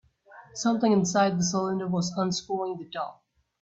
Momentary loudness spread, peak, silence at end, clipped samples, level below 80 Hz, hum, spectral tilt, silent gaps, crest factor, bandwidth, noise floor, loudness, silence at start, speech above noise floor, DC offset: 13 LU; -10 dBFS; 0.5 s; under 0.1%; -66 dBFS; none; -5 dB/octave; none; 18 dB; 8 kHz; -52 dBFS; -27 LUFS; 0.3 s; 26 dB; under 0.1%